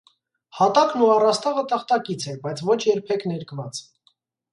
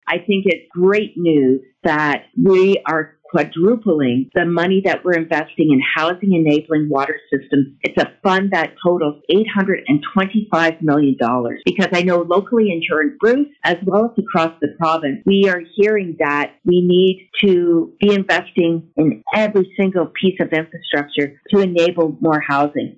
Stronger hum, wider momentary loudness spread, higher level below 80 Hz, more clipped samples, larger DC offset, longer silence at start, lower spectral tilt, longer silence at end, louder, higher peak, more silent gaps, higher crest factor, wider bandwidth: neither; first, 14 LU vs 5 LU; second, -70 dBFS vs -58 dBFS; neither; neither; first, 0.55 s vs 0.05 s; second, -5 dB/octave vs -7 dB/octave; first, 0.7 s vs 0.05 s; second, -21 LUFS vs -16 LUFS; about the same, -4 dBFS vs -4 dBFS; neither; first, 18 dB vs 12 dB; first, 11.5 kHz vs 8 kHz